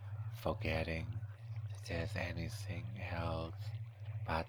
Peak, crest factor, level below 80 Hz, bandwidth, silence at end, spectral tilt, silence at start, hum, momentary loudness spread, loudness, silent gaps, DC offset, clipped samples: -20 dBFS; 20 dB; -54 dBFS; 20 kHz; 0 s; -6.5 dB/octave; 0 s; none; 8 LU; -42 LUFS; none; under 0.1%; under 0.1%